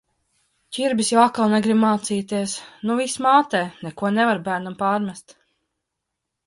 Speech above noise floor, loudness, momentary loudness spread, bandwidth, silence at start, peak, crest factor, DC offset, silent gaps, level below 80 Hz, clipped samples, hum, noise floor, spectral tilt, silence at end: 60 dB; -21 LUFS; 11 LU; 11.5 kHz; 0.7 s; -2 dBFS; 20 dB; under 0.1%; none; -66 dBFS; under 0.1%; none; -81 dBFS; -4.5 dB/octave; 1.25 s